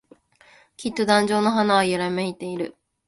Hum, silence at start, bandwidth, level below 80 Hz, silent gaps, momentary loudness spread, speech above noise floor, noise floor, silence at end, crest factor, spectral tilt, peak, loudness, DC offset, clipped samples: none; 0.8 s; 11.5 kHz; -62 dBFS; none; 12 LU; 33 dB; -55 dBFS; 0.35 s; 20 dB; -4.5 dB/octave; -4 dBFS; -22 LUFS; under 0.1%; under 0.1%